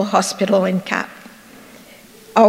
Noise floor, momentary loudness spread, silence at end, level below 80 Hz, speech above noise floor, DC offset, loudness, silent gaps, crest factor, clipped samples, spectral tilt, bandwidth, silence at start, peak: -43 dBFS; 24 LU; 0 s; -64 dBFS; 26 dB; under 0.1%; -19 LUFS; none; 18 dB; under 0.1%; -5 dB/octave; 16 kHz; 0 s; 0 dBFS